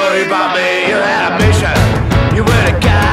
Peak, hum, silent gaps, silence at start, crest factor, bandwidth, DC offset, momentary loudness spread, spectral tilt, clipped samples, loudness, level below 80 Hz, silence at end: 0 dBFS; none; none; 0 s; 10 dB; 15.5 kHz; under 0.1%; 2 LU; -5.5 dB/octave; under 0.1%; -11 LUFS; -22 dBFS; 0 s